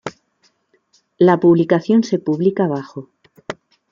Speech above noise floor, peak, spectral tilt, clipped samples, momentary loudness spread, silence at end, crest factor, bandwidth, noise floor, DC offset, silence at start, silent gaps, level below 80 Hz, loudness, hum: 47 dB; -2 dBFS; -8 dB/octave; under 0.1%; 21 LU; 0.4 s; 16 dB; 7.4 kHz; -62 dBFS; under 0.1%; 0.05 s; none; -62 dBFS; -16 LUFS; none